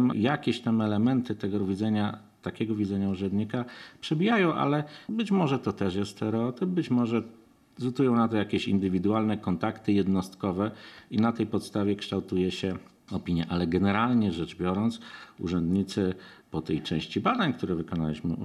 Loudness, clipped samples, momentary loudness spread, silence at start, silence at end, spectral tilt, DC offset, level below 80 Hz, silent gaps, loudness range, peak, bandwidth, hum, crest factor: -28 LUFS; under 0.1%; 9 LU; 0 s; 0 s; -7 dB/octave; under 0.1%; -62 dBFS; none; 2 LU; -10 dBFS; 12 kHz; none; 18 dB